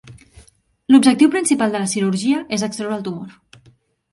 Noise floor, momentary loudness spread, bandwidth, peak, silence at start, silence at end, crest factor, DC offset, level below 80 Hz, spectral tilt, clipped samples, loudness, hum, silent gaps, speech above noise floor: -54 dBFS; 17 LU; 11.5 kHz; 0 dBFS; 0.05 s; 0.8 s; 18 dB; under 0.1%; -58 dBFS; -4.5 dB/octave; under 0.1%; -17 LUFS; none; none; 38 dB